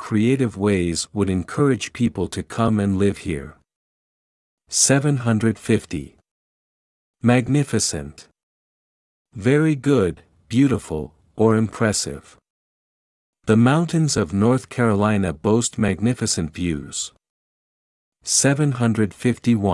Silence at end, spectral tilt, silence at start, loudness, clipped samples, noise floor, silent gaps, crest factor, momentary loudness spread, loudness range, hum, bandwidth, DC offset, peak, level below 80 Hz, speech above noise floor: 0 s; -5 dB/octave; 0 s; -20 LUFS; under 0.1%; under -90 dBFS; 3.76-4.58 s, 6.31-7.14 s, 8.43-9.25 s, 12.50-13.33 s, 17.30-18.12 s; 18 dB; 11 LU; 4 LU; none; 12 kHz; under 0.1%; -2 dBFS; -50 dBFS; over 71 dB